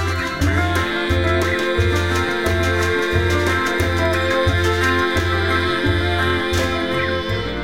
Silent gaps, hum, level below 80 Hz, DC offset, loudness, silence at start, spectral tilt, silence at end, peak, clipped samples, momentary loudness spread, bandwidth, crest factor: none; none; -30 dBFS; 1%; -18 LUFS; 0 s; -5.5 dB/octave; 0 s; -4 dBFS; under 0.1%; 3 LU; 16 kHz; 14 dB